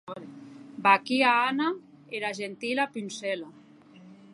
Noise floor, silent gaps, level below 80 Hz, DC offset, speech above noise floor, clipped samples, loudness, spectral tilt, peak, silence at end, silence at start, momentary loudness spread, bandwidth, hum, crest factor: -52 dBFS; none; -82 dBFS; under 0.1%; 26 dB; under 0.1%; -26 LUFS; -3.5 dB/octave; -6 dBFS; 0.2 s; 0.05 s; 22 LU; 11.5 kHz; none; 24 dB